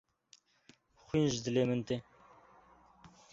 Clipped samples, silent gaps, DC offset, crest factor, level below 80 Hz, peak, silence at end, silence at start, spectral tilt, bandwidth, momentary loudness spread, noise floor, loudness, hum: under 0.1%; none; under 0.1%; 20 dB; -66 dBFS; -18 dBFS; 0.25 s; 1.15 s; -6 dB/octave; 7.8 kHz; 8 LU; -67 dBFS; -34 LUFS; none